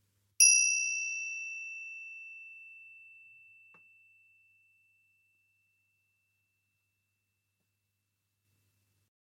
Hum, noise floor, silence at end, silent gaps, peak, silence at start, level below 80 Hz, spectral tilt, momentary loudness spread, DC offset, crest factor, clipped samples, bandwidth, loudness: 50 Hz at -90 dBFS; -83 dBFS; 6.4 s; none; -10 dBFS; 0.4 s; under -90 dBFS; 7 dB/octave; 28 LU; under 0.1%; 28 dB; under 0.1%; 16.5 kHz; -26 LUFS